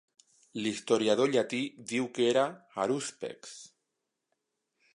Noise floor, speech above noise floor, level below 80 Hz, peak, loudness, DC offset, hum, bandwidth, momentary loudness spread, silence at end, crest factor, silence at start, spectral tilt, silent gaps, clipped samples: -85 dBFS; 54 dB; -80 dBFS; -12 dBFS; -30 LUFS; under 0.1%; none; 11.5 kHz; 16 LU; 1.3 s; 20 dB; 0.55 s; -4 dB/octave; none; under 0.1%